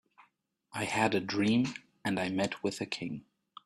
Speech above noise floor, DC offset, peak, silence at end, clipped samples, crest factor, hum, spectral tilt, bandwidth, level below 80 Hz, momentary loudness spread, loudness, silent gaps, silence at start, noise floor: 40 dB; under 0.1%; -12 dBFS; 0.45 s; under 0.1%; 22 dB; none; -5 dB/octave; 14 kHz; -68 dBFS; 11 LU; -32 LUFS; none; 0.75 s; -71 dBFS